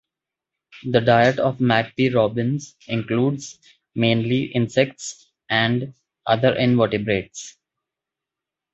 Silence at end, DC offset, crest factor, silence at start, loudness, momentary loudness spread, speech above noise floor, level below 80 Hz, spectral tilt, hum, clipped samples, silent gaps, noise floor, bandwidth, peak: 1.25 s; under 0.1%; 20 dB; 0.75 s; -20 LUFS; 16 LU; 67 dB; -56 dBFS; -6 dB/octave; none; under 0.1%; none; -87 dBFS; 8.2 kHz; -2 dBFS